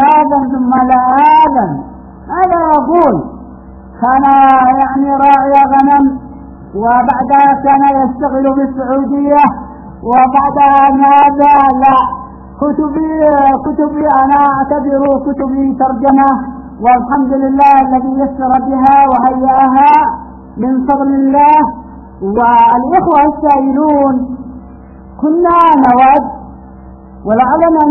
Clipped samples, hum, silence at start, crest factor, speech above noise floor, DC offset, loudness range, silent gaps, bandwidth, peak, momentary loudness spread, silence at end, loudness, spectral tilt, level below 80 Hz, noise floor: 0.2%; none; 0 s; 10 dB; 24 dB; under 0.1%; 2 LU; none; 5.4 kHz; 0 dBFS; 11 LU; 0 s; -9 LUFS; -9 dB/octave; -36 dBFS; -32 dBFS